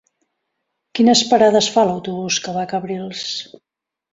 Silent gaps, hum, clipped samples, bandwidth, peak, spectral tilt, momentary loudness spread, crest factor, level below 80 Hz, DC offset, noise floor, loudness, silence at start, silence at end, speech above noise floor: none; none; under 0.1%; 7.8 kHz; -2 dBFS; -3.5 dB/octave; 13 LU; 18 dB; -62 dBFS; under 0.1%; -75 dBFS; -17 LUFS; 0.95 s; 0.7 s; 58 dB